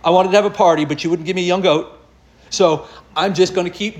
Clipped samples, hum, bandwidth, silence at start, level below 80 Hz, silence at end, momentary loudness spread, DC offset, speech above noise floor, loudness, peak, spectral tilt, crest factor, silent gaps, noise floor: under 0.1%; none; 11 kHz; 0.05 s; -52 dBFS; 0 s; 10 LU; under 0.1%; 32 dB; -16 LUFS; -2 dBFS; -4.5 dB/octave; 16 dB; none; -48 dBFS